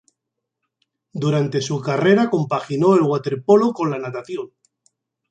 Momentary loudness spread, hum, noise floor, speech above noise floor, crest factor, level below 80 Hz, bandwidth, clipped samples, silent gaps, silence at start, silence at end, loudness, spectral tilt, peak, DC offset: 14 LU; none; -81 dBFS; 62 dB; 18 dB; -66 dBFS; 9 kHz; under 0.1%; none; 1.15 s; 0.85 s; -19 LUFS; -7 dB/octave; -2 dBFS; under 0.1%